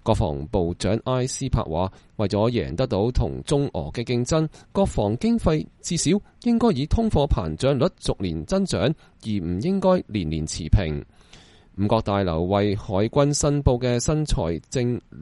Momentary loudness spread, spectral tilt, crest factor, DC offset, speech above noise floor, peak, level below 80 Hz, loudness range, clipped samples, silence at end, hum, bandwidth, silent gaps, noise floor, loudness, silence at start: 7 LU; -6 dB/octave; 20 dB; under 0.1%; 27 dB; -2 dBFS; -34 dBFS; 2 LU; under 0.1%; 0 s; none; 11.5 kHz; none; -50 dBFS; -23 LUFS; 0.05 s